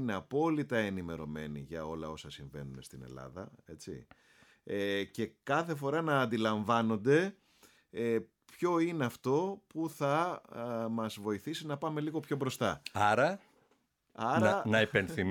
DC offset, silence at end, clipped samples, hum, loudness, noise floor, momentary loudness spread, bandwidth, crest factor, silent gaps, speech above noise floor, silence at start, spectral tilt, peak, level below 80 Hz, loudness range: under 0.1%; 0 s; under 0.1%; none; -33 LUFS; -74 dBFS; 18 LU; 18.5 kHz; 20 dB; none; 41 dB; 0 s; -6 dB/octave; -14 dBFS; -66 dBFS; 10 LU